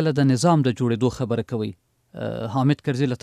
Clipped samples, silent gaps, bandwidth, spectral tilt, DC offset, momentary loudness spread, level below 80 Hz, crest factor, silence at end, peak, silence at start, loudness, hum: under 0.1%; none; 12.5 kHz; -7 dB/octave; under 0.1%; 12 LU; -56 dBFS; 16 dB; 0.05 s; -6 dBFS; 0 s; -22 LUFS; none